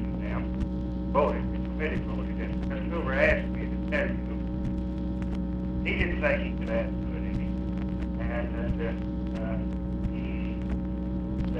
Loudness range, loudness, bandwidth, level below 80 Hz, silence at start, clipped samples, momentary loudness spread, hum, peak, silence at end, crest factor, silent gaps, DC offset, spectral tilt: 3 LU; -30 LUFS; 6 kHz; -34 dBFS; 0 s; under 0.1%; 6 LU; none; -10 dBFS; 0 s; 18 dB; none; under 0.1%; -9 dB/octave